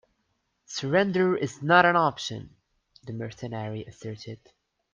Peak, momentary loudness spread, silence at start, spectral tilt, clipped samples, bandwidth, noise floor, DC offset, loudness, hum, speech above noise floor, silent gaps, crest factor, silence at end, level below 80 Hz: -4 dBFS; 21 LU; 0.7 s; -5.5 dB/octave; under 0.1%; 9.6 kHz; -75 dBFS; under 0.1%; -25 LUFS; none; 49 dB; none; 22 dB; 0.6 s; -66 dBFS